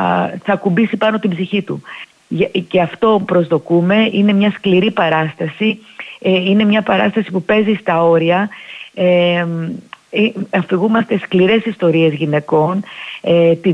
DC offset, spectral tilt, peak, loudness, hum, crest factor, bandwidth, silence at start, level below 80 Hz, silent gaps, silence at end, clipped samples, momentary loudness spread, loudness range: under 0.1%; -8 dB/octave; -2 dBFS; -15 LUFS; none; 12 dB; 7.4 kHz; 0 s; -58 dBFS; none; 0 s; under 0.1%; 11 LU; 2 LU